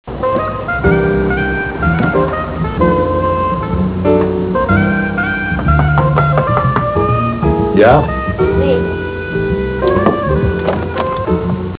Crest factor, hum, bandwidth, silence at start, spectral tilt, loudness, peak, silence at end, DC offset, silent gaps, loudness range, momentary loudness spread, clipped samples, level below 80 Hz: 14 dB; none; 4 kHz; 0.05 s; -11.5 dB/octave; -14 LUFS; 0 dBFS; 0.05 s; 0.4%; none; 2 LU; 5 LU; under 0.1%; -24 dBFS